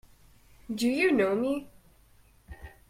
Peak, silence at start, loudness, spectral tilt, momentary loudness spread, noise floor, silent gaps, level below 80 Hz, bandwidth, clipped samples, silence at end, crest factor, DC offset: -14 dBFS; 0.7 s; -27 LUFS; -5 dB/octave; 22 LU; -60 dBFS; none; -56 dBFS; 16 kHz; under 0.1%; 0.2 s; 18 dB; under 0.1%